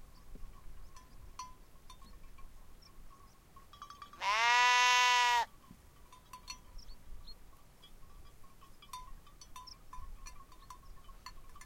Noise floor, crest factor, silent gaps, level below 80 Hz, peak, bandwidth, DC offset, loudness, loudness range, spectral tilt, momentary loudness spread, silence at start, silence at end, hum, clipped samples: -58 dBFS; 26 dB; none; -56 dBFS; -12 dBFS; 16.5 kHz; under 0.1%; -28 LUFS; 24 LU; 0.5 dB/octave; 30 LU; 0 s; 0 s; none; under 0.1%